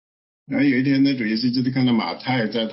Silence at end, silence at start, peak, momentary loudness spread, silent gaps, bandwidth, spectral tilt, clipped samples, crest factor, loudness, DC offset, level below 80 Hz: 0 s; 0.5 s; -10 dBFS; 5 LU; none; 5.8 kHz; -10 dB/octave; under 0.1%; 12 dB; -20 LUFS; under 0.1%; -66 dBFS